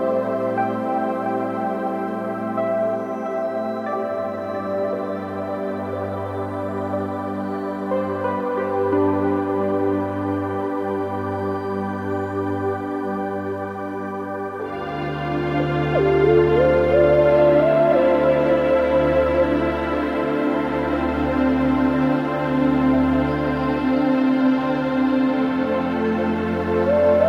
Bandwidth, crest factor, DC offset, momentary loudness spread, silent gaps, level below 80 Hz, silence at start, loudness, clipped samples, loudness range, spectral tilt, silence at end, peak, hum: 7.4 kHz; 16 dB; under 0.1%; 10 LU; none; -44 dBFS; 0 s; -21 LUFS; under 0.1%; 9 LU; -8.5 dB/octave; 0 s; -4 dBFS; none